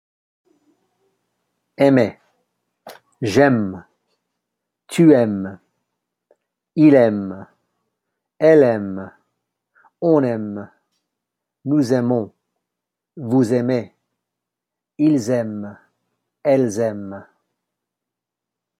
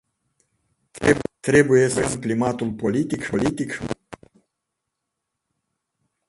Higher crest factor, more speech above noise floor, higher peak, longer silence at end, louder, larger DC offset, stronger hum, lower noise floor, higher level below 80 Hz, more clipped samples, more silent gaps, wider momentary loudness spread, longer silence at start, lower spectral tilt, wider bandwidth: about the same, 20 dB vs 22 dB; first, 68 dB vs 60 dB; about the same, -2 dBFS vs -2 dBFS; second, 1.55 s vs 2.15 s; first, -17 LUFS vs -21 LUFS; neither; neither; about the same, -84 dBFS vs -81 dBFS; second, -66 dBFS vs -50 dBFS; neither; neither; first, 20 LU vs 11 LU; first, 1.8 s vs 0.95 s; first, -7.5 dB/octave vs -5.5 dB/octave; first, 13.5 kHz vs 11.5 kHz